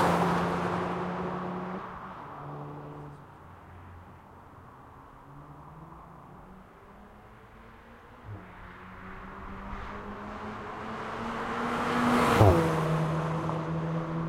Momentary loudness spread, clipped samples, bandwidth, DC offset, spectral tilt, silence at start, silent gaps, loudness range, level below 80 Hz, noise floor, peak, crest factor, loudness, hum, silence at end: 25 LU; under 0.1%; 16 kHz; under 0.1%; -6.5 dB/octave; 0 s; none; 23 LU; -50 dBFS; -51 dBFS; -4 dBFS; 28 dB; -30 LUFS; none; 0 s